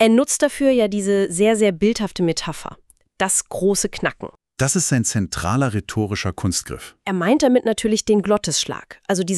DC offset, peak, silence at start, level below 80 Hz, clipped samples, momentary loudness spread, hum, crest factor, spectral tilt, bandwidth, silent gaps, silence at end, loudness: under 0.1%; -2 dBFS; 0 s; -46 dBFS; under 0.1%; 10 LU; none; 16 dB; -4.5 dB/octave; 13.5 kHz; none; 0 s; -19 LUFS